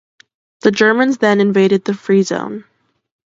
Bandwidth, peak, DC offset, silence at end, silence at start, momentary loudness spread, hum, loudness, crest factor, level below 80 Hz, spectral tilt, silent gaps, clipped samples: 7.8 kHz; 0 dBFS; under 0.1%; 0.75 s; 0.65 s; 10 LU; none; -14 LUFS; 16 dB; -62 dBFS; -5.5 dB/octave; none; under 0.1%